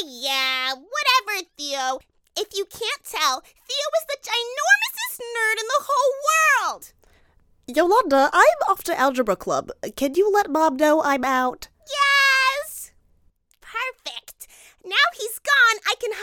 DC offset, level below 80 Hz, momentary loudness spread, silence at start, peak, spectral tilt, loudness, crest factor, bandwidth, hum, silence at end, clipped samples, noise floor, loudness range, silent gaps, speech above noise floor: under 0.1%; -60 dBFS; 13 LU; 0 s; -2 dBFS; -1 dB/octave; -20 LUFS; 22 dB; 19 kHz; none; 0 s; under 0.1%; -61 dBFS; 4 LU; none; 40 dB